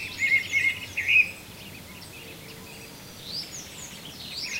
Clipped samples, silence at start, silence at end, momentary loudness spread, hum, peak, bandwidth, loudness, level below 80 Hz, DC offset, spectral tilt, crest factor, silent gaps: under 0.1%; 0 s; 0 s; 22 LU; none; -10 dBFS; 16 kHz; -24 LUFS; -58 dBFS; under 0.1%; -1 dB/octave; 20 dB; none